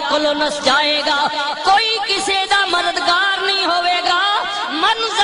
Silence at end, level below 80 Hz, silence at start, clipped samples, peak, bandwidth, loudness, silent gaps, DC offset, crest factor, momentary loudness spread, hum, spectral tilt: 0 s; -52 dBFS; 0 s; under 0.1%; -4 dBFS; 11 kHz; -15 LUFS; none; under 0.1%; 12 dB; 3 LU; none; -0.5 dB/octave